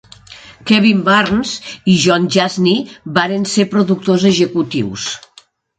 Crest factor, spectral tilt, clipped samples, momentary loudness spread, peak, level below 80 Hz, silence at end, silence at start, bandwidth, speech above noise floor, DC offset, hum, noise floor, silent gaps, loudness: 14 dB; -5 dB/octave; under 0.1%; 10 LU; 0 dBFS; -50 dBFS; 0.6 s; 0.3 s; 9.2 kHz; 34 dB; under 0.1%; none; -47 dBFS; none; -14 LUFS